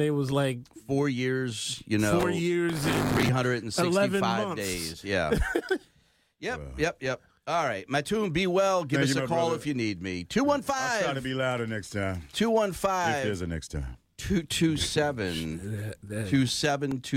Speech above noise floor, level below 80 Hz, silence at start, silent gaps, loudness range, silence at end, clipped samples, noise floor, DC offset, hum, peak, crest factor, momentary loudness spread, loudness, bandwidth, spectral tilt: 38 dB; -46 dBFS; 0 s; none; 4 LU; 0 s; under 0.1%; -66 dBFS; under 0.1%; none; -14 dBFS; 14 dB; 9 LU; -28 LUFS; 16.5 kHz; -5 dB/octave